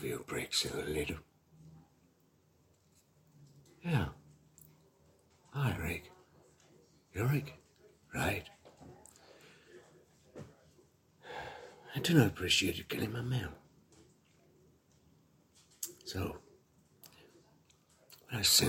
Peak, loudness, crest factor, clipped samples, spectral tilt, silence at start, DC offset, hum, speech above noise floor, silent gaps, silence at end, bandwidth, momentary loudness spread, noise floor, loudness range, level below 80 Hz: -12 dBFS; -35 LUFS; 26 dB; under 0.1%; -3.5 dB/octave; 0 s; under 0.1%; none; 36 dB; none; 0 s; 16.5 kHz; 28 LU; -70 dBFS; 13 LU; -60 dBFS